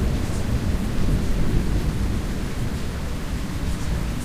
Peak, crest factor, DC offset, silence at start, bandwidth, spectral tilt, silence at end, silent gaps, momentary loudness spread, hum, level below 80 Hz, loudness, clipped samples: -6 dBFS; 16 dB; under 0.1%; 0 s; 15.5 kHz; -6 dB/octave; 0 s; none; 5 LU; none; -26 dBFS; -26 LUFS; under 0.1%